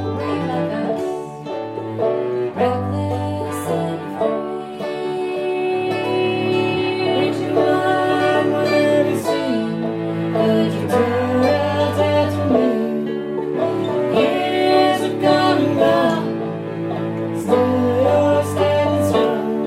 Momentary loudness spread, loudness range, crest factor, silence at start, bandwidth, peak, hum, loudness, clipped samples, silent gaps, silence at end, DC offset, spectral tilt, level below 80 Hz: 8 LU; 5 LU; 16 dB; 0 s; 15.5 kHz; -2 dBFS; none; -19 LUFS; under 0.1%; none; 0 s; under 0.1%; -6.5 dB/octave; -62 dBFS